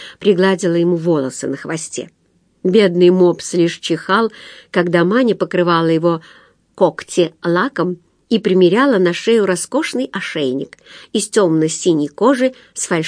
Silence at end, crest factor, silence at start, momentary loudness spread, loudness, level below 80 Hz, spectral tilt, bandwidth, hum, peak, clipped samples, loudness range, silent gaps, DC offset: 0 s; 16 dB; 0 s; 11 LU; -16 LUFS; -66 dBFS; -5 dB/octave; 10.5 kHz; none; 0 dBFS; under 0.1%; 2 LU; none; under 0.1%